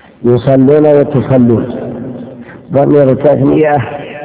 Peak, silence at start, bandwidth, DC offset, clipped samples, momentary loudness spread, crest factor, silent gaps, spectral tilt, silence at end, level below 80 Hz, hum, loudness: 0 dBFS; 0.2 s; 4 kHz; under 0.1%; 2%; 15 LU; 10 dB; none; -12.5 dB/octave; 0 s; -40 dBFS; none; -9 LUFS